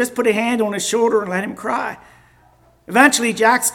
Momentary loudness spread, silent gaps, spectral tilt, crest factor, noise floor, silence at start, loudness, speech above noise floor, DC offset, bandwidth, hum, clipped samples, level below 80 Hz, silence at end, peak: 10 LU; none; -3 dB/octave; 18 dB; -53 dBFS; 0 s; -17 LUFS; 36 dB; under 0.1%; 19 kHz; none; under 0.1%; -60 dBFS; 0 s; 0 dBFS